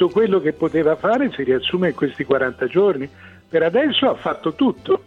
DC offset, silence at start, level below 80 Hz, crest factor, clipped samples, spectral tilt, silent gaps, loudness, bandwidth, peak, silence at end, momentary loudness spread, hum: under 0.1%; 0 s; -54 dBFS; 14 dB; under 0.1%; -7.5 dB/octave; none; -19 LUFS; 7.2 kHz; -4 dBFS; 0.05 s; 6 LU; none